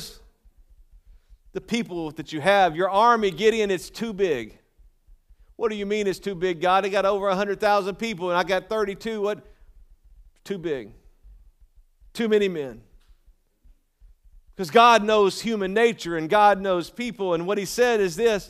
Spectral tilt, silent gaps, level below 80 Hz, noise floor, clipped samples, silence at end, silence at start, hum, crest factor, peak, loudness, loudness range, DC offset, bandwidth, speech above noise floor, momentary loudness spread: -4.5 dB/octave; none; -54 dBFS; -59 dBFS; under 0.1%; 0 s; 0 s; none; 20 dB; -4 dBFS; -23 LUFS; 10 LU; under 0.1%; 15 kHz; 37 dB; 14 LU